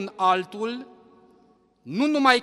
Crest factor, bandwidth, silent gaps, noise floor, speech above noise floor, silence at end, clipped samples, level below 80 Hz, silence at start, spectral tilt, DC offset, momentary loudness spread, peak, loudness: 22 dB; 12.5 kHz; none; -60 dBFS; 37 dB; 0 s; under 0.1%; -74 dBFS; 0 s; -4 dB/octave; under 0.1%; 13 LU; -2 dBFS; -24 LUFS